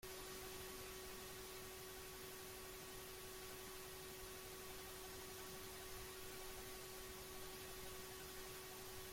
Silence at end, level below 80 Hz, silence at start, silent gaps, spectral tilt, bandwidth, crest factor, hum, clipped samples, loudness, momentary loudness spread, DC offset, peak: 0 s; -66 dBFS; 0 s; none; -2.5 dB/octave; 16.5 kHz; 14 dB; none; under 0.1%; -53 LUFS; 1 LU; under 0.1%; -40 dBFS